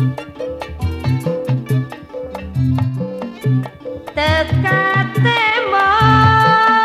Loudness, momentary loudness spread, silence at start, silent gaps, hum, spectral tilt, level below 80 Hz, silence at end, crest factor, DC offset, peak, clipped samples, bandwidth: -15 LUFS; 16 LU; 0 s; none; none; -6.5 dB/octave; -36 dBFS; 0 s; 16 dB; under 0.1%; 0 dBFS; under 0.1%; 13.5 kHz